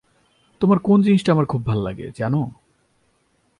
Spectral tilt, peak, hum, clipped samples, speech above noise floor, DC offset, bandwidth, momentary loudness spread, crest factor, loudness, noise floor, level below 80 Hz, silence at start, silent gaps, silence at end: -8.5 dB/octave; -4 dBFS; none; under 0.1%; 46 dB; under 0.1%; 10.5 kHz; 11 LU; 18 dB; -19 LUFS; -64 dBFS; -50 dBFS; 0.6 s; none; 1.05 s